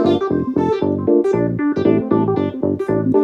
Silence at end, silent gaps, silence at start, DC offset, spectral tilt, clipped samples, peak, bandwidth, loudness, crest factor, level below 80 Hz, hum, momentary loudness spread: 0 s; none; 0 s; under 0.1%; -9 dB/octave; under 0.1%; -2 dBFS; 7.4 kHz; -17 LUFS; 14 dB; -50 dBFS; none; 3 LU